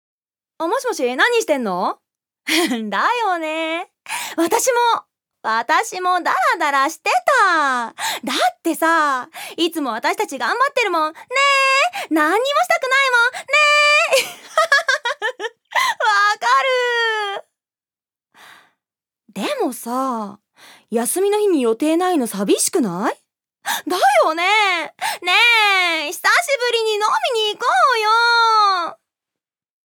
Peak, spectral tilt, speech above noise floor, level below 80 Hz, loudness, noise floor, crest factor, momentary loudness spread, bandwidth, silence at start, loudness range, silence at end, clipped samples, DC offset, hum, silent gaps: -2 dBFS; -1.5 dB/octave; over 72 dB; -82 dBFS; -17 LUFS; under -90 dBFS; 16 dB; 11 LU; over 20 kHz; 0.6 s; 6 LU; 1 s; under 0.1%; under 0.1%; none; none